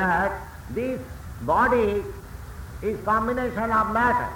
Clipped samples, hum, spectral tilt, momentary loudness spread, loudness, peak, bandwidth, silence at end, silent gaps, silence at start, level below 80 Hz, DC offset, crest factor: under 0.1%; none; -6.5 dB/octave; 18 LU; -24 LUFS; -8 dBFS; 19.5 kHz; 0 s; none; 0 s; -40 dBFS; under 0.1%; 16 dB